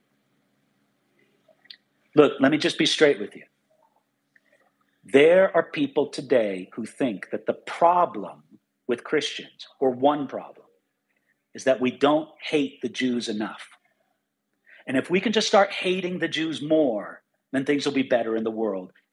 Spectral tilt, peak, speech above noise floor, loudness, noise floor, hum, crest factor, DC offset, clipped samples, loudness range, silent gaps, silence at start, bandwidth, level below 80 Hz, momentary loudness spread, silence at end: -4.5 dB/octave; -2 dBFS; 54 dB; -23 LUFS; -77 dBFS; none; 24 dB; under 0.1%; under 0.1%; 5 LU; none; 2.15 s; 11.5 kHz; -82 dBFS; 14 LU; 0.25 s